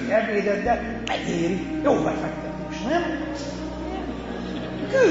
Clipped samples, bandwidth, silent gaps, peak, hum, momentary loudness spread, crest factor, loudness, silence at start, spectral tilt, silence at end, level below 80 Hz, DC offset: under 0.1%; 8 kHz; none; -8 dBFS; none; 10 LU; 18 dB; -26 LUFS; 0 s; -6 dB/octave; 0 s; -42 dBFS; under 0.1%